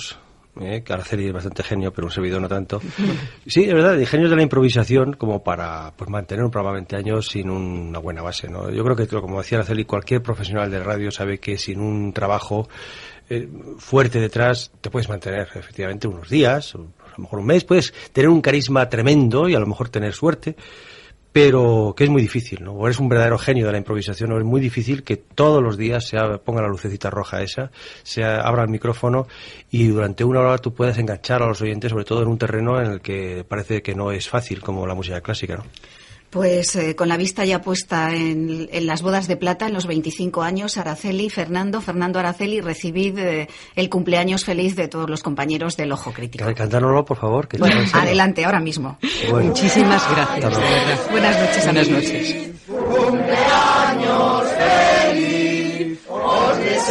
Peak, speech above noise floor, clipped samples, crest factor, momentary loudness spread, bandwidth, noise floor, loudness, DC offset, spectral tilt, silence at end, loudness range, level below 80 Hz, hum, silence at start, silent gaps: -2 dBFS; 19 dB; under 0.1%; 18 dB; 12 LU; 11.5 kHz; -39 dBFS; -19 LUFS; under 0.1%; -5.5 dB/octave; 0 s; 7 LU; -46 dBFS; none; 0 s; none